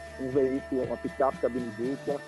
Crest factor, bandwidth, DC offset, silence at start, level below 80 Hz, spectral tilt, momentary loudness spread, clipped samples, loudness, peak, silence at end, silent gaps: 16 dB; 11.5 kHz; under 0.1%; 0 s; -54 dBFS; -7 dB/octave; 5 LU; under 0.1%; -30 LUFS; -14 dBFS; 0 s; none